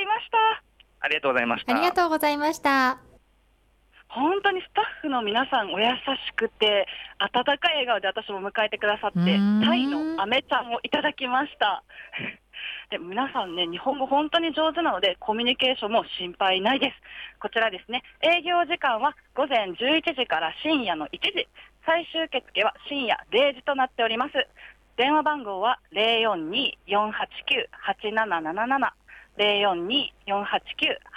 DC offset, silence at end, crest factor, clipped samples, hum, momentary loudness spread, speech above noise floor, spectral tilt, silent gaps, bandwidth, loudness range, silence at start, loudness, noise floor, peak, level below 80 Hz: under 0.1%; 0 s; 16 dB; under 0.1%; none; 9 LU; 38 dB; -4.5 dB/octave; none; 15.5 kHz; 3 LU; 0 s; -24 LUFS; -63 dBFS; -10 dBFS; -62 dBFS